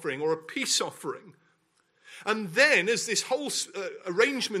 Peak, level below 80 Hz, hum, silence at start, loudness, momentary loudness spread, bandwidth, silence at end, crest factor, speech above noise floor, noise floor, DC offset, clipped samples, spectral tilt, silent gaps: -6 dBFS; -82 dBFS; none; 0 s; -26 LUFS; 15 LU; 16 kHz; 0 s; 22 dB; 42 dB; -70 dBFS; under 0.1%; under 0.1%; -2 dB/octave; none